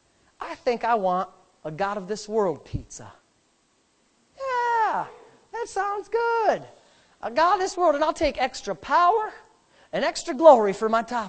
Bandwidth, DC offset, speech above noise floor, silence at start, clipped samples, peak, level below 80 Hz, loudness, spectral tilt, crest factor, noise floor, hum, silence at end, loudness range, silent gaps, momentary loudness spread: 9 kHz; under 0.1%; 43 dB; 0.4 s; under 0.1%; -2 dBFS; -52 dBFS; -23 LUFS; -4.5 dB/octave; 22 dB; -66 dBFS; none; 0 s; 8 LU; none; 17 LU